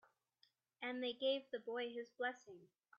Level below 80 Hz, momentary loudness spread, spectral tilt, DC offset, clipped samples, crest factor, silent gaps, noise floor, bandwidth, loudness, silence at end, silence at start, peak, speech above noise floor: under -90 dBFS; 17 LU; 0.5 dB/octave; under 0.1%; under 0.1%; 18 dB; none; -79 dBFS; 7 kHz; -44 LUFS; 0.35 s; 0.8 s; -28 dBFS; 35 dB